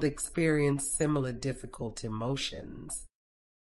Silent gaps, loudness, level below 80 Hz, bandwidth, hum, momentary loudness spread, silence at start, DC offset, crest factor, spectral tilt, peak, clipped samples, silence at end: none; -32 LUFS; -52 dBFS; 13.5 kHz; none; 12 LU; 0 s; under 0.1%; 16 dB; -4.5 dB/octave; -16 dBFS; under 0.1%; 0.65 s